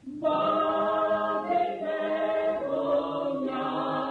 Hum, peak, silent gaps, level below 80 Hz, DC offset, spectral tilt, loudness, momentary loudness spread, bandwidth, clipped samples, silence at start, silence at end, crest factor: none; -16 dBFS; none; -64 dBFS; under 0.1%; -7 dB/octave; -27 LUFS; 5 LU; 6.2 kHz; under 0.1%; 0.05 s; 0 s; 12 dB